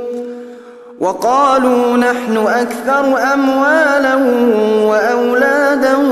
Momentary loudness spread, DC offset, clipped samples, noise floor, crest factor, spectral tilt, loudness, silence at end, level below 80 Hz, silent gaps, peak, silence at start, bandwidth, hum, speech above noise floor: 9 LU; under 0.1%; under 0.1%; -34 dBFS; 12 dB; -4.5 dB/octave; -12 LUFS; 0 s; -56 dBFS; none; 0 dBFS; 0 s; 14 kHz; none; 22 dB